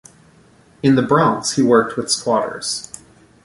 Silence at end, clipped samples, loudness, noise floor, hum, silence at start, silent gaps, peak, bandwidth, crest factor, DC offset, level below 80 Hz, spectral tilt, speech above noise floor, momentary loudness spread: 0.5 s; under 0.1%; -17 LUFS; -50 dBFS; none; 0.85 s; none; -2 dBFS; 11.5 kHz; 16 dB; under 0.1%; -56 dBFS; -4.5 dB/octave; 34 dB; 11 LU